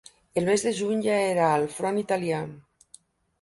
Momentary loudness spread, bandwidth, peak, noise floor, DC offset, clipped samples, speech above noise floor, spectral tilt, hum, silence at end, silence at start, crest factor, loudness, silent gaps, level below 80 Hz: 8 LU; 11.5 kHz; -10 dBFS; -56 dBFS; under 0.1%; under 0.1%; 31 dB; -5 dB/octave; none; 0.8 s; 0.35 s; 16 dB; -25 LUFS; none; -66 dBFS